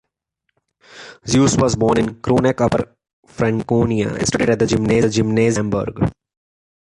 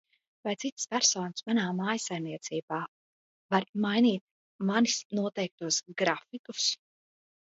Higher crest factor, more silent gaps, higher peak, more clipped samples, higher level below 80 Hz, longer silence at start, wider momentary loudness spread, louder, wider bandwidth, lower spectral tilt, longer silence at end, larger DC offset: second, 16 dB vs 22 dB; second, 3.13-3.23 s vs 0.72-0.77 s, 2.63-2.68 s, 2.88-3.49 s, 3.69-3.73 s, 4.21-4.59 s, 5.05-5.10 s, 5.51-5.58 s, 6.39-6.44 s; first, -2 dBFS vs -10 dBFS; neither; first, -40 dBFS vs -78 dBFS; first, 0.95 s vs 0.45 s; second, 7 LU vs 11 LU; first, -17 LUFS vs -30 LUFS; first, 11.5 kHz vs 8 kHz; first, -5.5 dB/octave vs -3 dB/octave; about the same, 0.8 s vs 0.7 s; neither